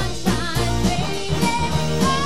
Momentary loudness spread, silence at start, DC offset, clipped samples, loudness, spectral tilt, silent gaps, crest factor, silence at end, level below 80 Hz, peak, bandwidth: 3 LU; 0 s; 4%; under 0.1%; -21 LUFS; -4.5 dB/octave; none; 14 dB; 0 s; -32 dBFS; -6 dBFS; 16 kHz